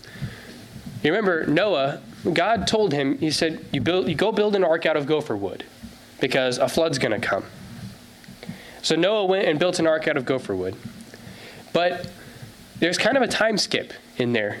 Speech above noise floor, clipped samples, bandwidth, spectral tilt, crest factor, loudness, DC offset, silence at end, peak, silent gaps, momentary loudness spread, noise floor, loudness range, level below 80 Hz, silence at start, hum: 22 dB; under 0.1%; 16.5 kHz; -4.5 dB/octave; 16 dB; -22 LUFS; under 0.1%; 0 s; -6 dBFS; none; 20 LU; -44 dBFS; 4 LU; -54 dBFS; 0.05 s; none